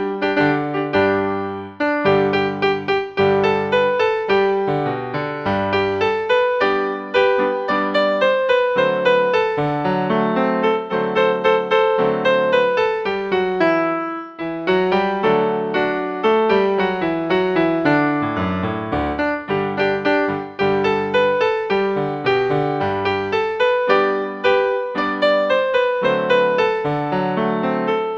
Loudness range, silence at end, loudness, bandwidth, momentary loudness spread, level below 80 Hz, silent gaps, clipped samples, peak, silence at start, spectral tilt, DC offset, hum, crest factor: 2 LU; 0 s; -18 LUFS; 7.2 kHz; 5 LU; -50 dBFS; none; under 0.1%; -2 dBFS; 0 s; -7 dB/octave; under 0.1%; none; 16 dB